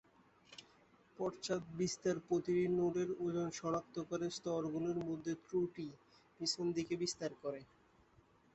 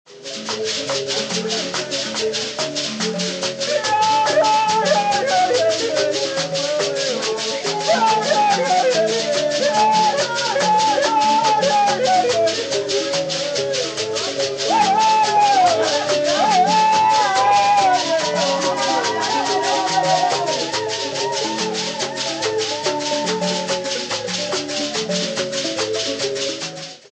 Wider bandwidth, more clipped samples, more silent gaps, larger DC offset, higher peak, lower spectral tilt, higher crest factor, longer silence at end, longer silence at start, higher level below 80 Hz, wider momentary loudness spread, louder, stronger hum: second, 8.2 kHz vs 10 kHz; neither; neither; neither; second, -24 dBFS vs -4 dBFS; first, -5 dB/octave vs -2 dB/octave; about the same, 16 dB vs 14 dB; first, 0.9 s vs 0.15 s; first, 0.5 s vs 0.1 s; second, -74 dBFS vs -60 dBFS; first, 11 LU vs 7 LU; second, -40 LUFS vs -18 LUFS; neither